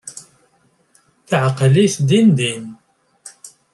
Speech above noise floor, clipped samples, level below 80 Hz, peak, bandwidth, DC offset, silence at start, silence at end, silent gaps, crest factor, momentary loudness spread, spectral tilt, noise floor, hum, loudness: 45 dB; under 0.1%; -58 dBFS; -2 dBFS; 12 kHz; under 0.1%; 0.05 s; 0.25 s; none; 16 dB; 24 LU; -6 dB/octave; -59 dBFS; none; -15 LUFS